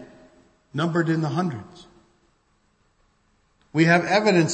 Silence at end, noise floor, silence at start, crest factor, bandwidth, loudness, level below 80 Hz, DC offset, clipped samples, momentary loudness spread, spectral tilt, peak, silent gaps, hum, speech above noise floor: 0 s; -65 dBFS; 0 s; 20 dB; 8.8 kHz; -22 LUFS; -64 dBFS; under 0.1%; under 0.1%; 12 LU; -5.5 dB/octave; -4 dBFS; none; none; 44 dB